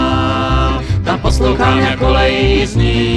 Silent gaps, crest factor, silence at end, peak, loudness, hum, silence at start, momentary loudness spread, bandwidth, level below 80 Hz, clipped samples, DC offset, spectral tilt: none; 12 dB; 0 s; 0 dBFS; -13 LUFS; none; 0 s; 4 LU; 11.5 kHz; -18 dBFS; under 0.1%; under 0.1%; -6 dB/octave